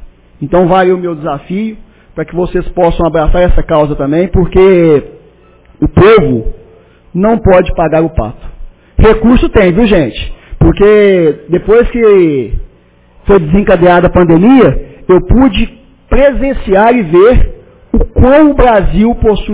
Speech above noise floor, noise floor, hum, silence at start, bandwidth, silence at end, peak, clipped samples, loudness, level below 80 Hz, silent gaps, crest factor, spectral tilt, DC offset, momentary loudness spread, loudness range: 36 dB; -43 dBFS; none; 0 s; 4 kHz; 0 s; 0 dBFS; 1%; -8 LUFS; -18 dBFS; none; 8 dB; -11.5 dB/octave; under 0.1%; 13 LU; 4 LU